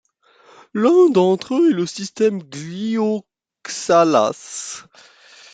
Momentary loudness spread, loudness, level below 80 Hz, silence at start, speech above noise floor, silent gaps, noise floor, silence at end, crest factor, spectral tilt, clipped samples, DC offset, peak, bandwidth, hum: 16 LU; -18 LUFS; -66 dBFS; 0.75 s; 35 dB; none; -53 dBFS; 0.75 s; 16 dB; -5 dB/octave; under 0.1%; under 0.1%; -2 dBFS; 9.4 kHz; none